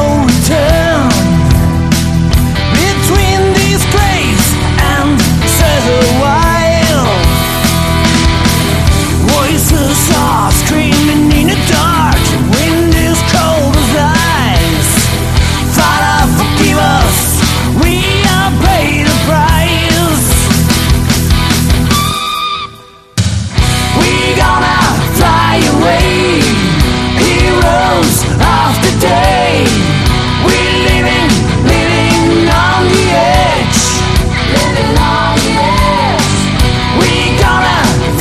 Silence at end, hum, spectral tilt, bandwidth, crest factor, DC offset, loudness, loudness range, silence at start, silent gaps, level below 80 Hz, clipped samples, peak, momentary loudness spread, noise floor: 0 s; none; -4.5 dB/octave; 14.5 kHz; 8 dB; under 0.1%; -9 LUFS; 1 LU; 0 s; none; -18 dBFS; under 0.1%; 0 dBFS; 2 LU; -34 dBFS